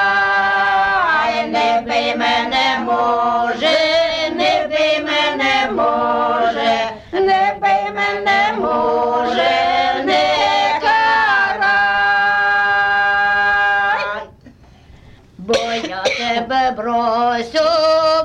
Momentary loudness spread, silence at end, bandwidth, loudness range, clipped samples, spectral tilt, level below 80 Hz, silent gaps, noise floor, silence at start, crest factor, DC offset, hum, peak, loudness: 4 LU; 0 s; 10.5 kHz; 4 LU; under 0.1%; -3 dB/octave; -48 dBFS; none; -44 dBFS; 0 s; 12 dB; under 0.1%; none; -4 dBFS; -15 LUFS